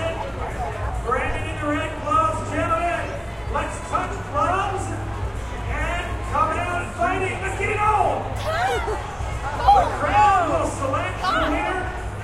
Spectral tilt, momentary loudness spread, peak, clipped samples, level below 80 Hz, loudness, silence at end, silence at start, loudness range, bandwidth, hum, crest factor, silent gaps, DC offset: -5.5 dB/octave; 11 LU; -4 dBFS; under 0.1%; -32 dBFS; -23 LUFS; 0 s; 0 s; 4 LU; 14 kHz; none; 18 dB; none; under 0.1%